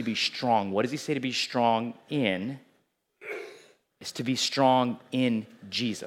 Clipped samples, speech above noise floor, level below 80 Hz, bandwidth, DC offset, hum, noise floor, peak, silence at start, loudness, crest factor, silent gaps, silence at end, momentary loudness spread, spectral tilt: under 0.1%; 44 dB; -82 dBFS; 15.5 kHz; under 0.1%; none; -71 dBFS; -10 dBFS; 0 s; -27 LUFS; 20 dB; none; 0 s; 16 LU; -4.5 dB/octave